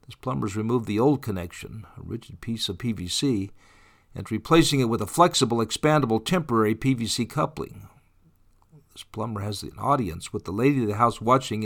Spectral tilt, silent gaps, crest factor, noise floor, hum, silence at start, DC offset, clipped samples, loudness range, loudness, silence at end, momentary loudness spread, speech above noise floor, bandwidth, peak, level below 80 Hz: -5 dB/octave; none; 22 dB; -59 dBFS; none; 0.1 s; under 0.1%; under 0.1%; 8 LU; -24 LUFS; 0 s; 17 LU; 35 dB; 19 kHz; -4 dBFS; -50 dBFS